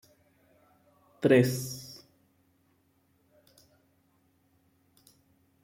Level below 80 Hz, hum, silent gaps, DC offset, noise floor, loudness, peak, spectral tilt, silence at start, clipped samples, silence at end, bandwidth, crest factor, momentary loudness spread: -74 dBFS; none; none; under 0.1%; -70 dBFS; -27 LUFS; -10 dBFS; -6 dB/octave; 1.2 s; under 0.1%; 3.7 s; 16.5 kHz; 24 dB; 25 LU